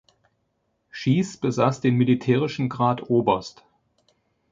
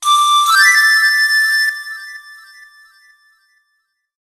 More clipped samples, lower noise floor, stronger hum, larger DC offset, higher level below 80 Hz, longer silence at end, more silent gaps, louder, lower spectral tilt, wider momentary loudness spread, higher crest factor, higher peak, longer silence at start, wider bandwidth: neither; first, -72 dBFS vs -67 dBFS; neither; neither; first, -60 dBFS vs -74 dBFS; second, 1 s vs 1.85 s; neither; second, -22 LUFS vs -10 LUFS; first, -7 dB/octave vs 8 dB/octave; second, 7 LU vs 21 LU; about the same, 20 dB vs 16 dB; second, -4 dBFS vs 0 dBFS; first, 0.95 s vs 0 s; second, 7.6 kHz vs 13 kHz